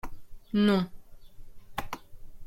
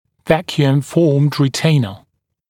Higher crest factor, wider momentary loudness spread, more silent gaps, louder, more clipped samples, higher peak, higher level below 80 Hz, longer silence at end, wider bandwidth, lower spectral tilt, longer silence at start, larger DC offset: about the same, 20 dB vs 16 dB; first, 19 LU vs 4 LU; neither; second, -29 LUFS vs -16 LUFS; neither; second, -12 dBFS vs 0 dBFS; first, -48 dBFS vs -54 dBFS; second, 0 s vs 0.55 s; about the same, 16.5 kHz vs 15 kHz; about the same, -7 dB/octave vs -6.5 dB/octave; second, 0.05 s vs 0.25 s; neither